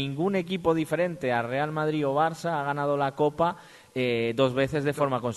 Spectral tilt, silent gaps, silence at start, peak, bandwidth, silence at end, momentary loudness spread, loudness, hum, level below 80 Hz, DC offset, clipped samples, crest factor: -6.5 dB/octave; none; 0 s; -10 dBFS; 12.5 kHz; 0 s; 4 LU; -27 LUFS; none; -60 dBFS; under 0.1%; under 0.1%; 16 dB